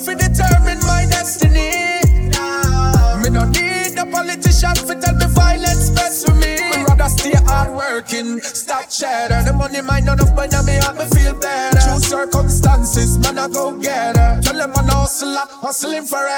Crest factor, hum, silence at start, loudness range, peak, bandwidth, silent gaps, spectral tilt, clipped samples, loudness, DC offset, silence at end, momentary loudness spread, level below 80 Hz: 14 dB; none; 0 s; 2 LU; 0 dBFS; 18.5 kHz; none; -4.5 dB/octave; under 0.1%; -15 LUFS; under 0.1%; 0 s; 6 LU; -18 dBFS